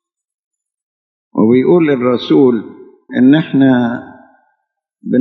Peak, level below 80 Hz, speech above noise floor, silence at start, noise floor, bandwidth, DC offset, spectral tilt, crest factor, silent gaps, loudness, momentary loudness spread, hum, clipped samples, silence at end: 0 dBFS; -66 dBFS; 59 dB; 1.35 s; -70 dBFS; 4.9 kHz; under 0.1%; -9.5 dB/octave; 14 dB; none; -12 LUFS; 12 LU; none; under 0.1%; 0 s